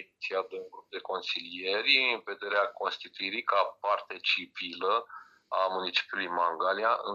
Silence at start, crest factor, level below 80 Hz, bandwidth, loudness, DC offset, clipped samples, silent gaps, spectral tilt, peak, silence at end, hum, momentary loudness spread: 0 s; 20 dB; -86 dBFS; 11 kHz; -30 LUFS; under 0.1%; under 0.1%; none; -2.5 dB/octave; -10 dBFS; 0 s; none; 12 LU